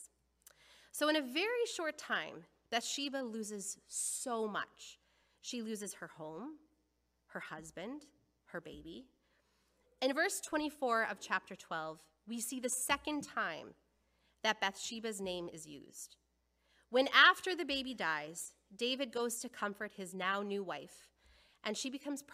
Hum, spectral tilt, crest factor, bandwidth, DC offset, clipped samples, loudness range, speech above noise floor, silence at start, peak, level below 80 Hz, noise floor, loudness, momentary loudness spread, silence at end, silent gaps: none; -1.5 dB/octave; 28 dB; 15.5 kHz; under 0.1%; under 0.1%; 14 LU; 42 dB; 0 s; -10 dBFS; -74 dBFS; -80 dBFS; -37 LUFS; 16 LU; 0 s; none